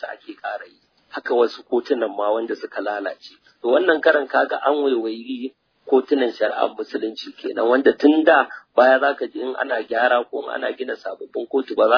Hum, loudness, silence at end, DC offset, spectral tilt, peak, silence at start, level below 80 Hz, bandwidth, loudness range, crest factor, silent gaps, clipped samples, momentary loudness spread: none; -20 LUFS; 0 s; under 0.1%; -4.5 dB/octave; -2 dBFS; 0 s; -74 dBFS; 5.4 kHz; 5 LU; 18 dB; none; under 0.1%; 15 LU